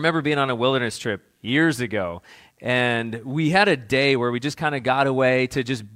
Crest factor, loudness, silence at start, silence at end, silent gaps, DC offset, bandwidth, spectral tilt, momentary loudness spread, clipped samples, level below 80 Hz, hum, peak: 20 dB; -21 LUFS; 0 s; 0 s; none; under 0.1%; 15.5 kHz; -5.5 dB/octave; 10 LU; under 0.1%; -58 dBFS; none; -2 dBFS